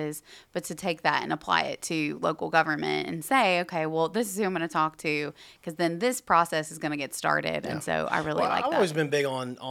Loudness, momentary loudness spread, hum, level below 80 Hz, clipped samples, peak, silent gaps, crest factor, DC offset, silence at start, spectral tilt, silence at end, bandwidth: -27 LUFS; 8 LU; none; -66 dBFS; under 0.1%; -6 dBFS; none; 22 dB; under 0.1%; 0 s; -4 dB/octave; 0 s; 17.5 kHz